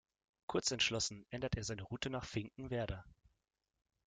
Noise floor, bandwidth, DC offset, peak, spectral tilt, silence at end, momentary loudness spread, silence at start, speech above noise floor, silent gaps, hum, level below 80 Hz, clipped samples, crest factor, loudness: -87 dBFS; 9.6 kHz; under 0.1%; -22 dBFS; -3.5 dB/octave; 0.95 s; 10 LU; 0.5 s; 47 dB; none; none; -58 dBFS; under 0.1%; 20 dB; -40 LUFS